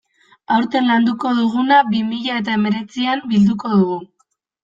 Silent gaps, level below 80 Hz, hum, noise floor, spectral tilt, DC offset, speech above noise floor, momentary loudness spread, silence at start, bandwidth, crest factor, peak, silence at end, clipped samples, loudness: none; -58 dBFS; none; -66 dBFS; -7 dB/octave; under 0.1%; 49 dB; 7 LU; 0.5 s; 7.4 kHz; 14 dB; -2 dBFS; 0.6 s; under 0.1%; -17 LUFS